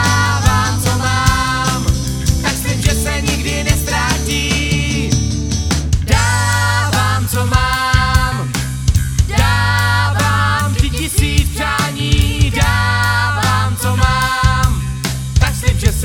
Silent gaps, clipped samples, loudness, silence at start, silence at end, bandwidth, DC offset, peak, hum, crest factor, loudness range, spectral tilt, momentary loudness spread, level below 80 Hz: none; under 0.1%; -15 LUFS; 0 s; 0 s; 18 kHz; under 0.1%; 0 dBFS; none; 14 dB; 1 LU; -4 dB/octave; 4 LU; -20 dBFS